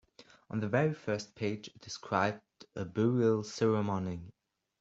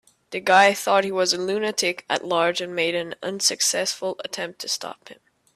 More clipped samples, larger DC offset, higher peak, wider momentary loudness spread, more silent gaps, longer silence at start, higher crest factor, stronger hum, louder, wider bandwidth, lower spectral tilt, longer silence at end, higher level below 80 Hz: neither; neither; second, -14 dBFS vs -4 dBFS; about the same, 15 LU vs 13 LU; neither; about the same, 0.2 s vs 0.3 s; about the same, 20 dB vs 20 dB; neither; second, -33 LUFS vs -22 LUFS; second, 8 kHz vs 16 kHz; first, -6.5 dB/octave vs -1.5 dB/octave; about the same, 0.5 s vs 0.45 s; about the same, -70 dBFS vs -72 dBFS